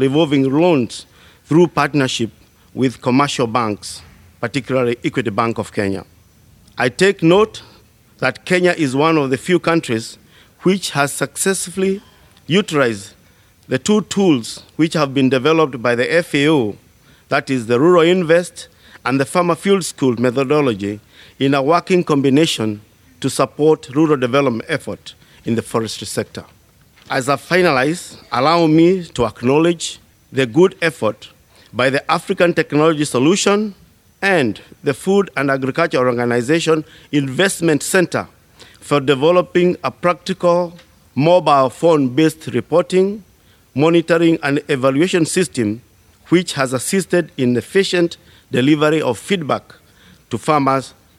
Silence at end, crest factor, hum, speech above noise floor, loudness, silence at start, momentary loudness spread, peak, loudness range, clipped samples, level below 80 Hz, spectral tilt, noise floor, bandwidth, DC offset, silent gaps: 0.3 s; 16 dB; none; 35 dB; -16 LUFS; 0 s; 10 LU; 0 dBFS; 3 LU; under 0.1%; -54 dBFS; -5 dB/octave; -50 dBFS; 15.5 kHz; under 0.1%; none